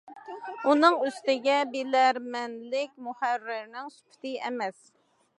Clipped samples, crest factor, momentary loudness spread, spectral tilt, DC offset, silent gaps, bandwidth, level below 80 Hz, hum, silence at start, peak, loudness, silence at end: under 0.1%; 22 dB; 19 LU; -3 dB/octave; under 0.1%; none; 11.5 kHz; -88 dBFS; none; 0.05 s; -6 dBFS; -27 LUFS; 0.65 s